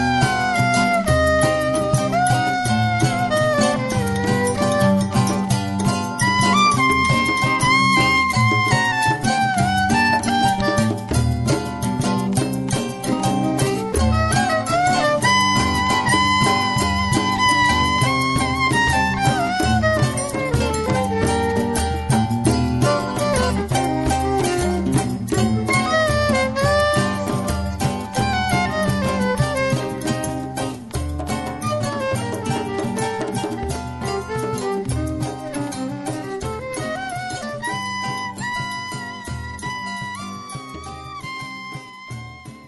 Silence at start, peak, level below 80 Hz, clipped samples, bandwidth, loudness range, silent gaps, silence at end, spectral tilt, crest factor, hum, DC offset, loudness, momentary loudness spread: 0 s; -4 dBFS; -34 dBFS; under 0.1%; 12 kHz; 10 LU; none; 0 s; -4.5 dB/octave; 14 dB; none; under 0.1%; -19 LUFS; 11 LU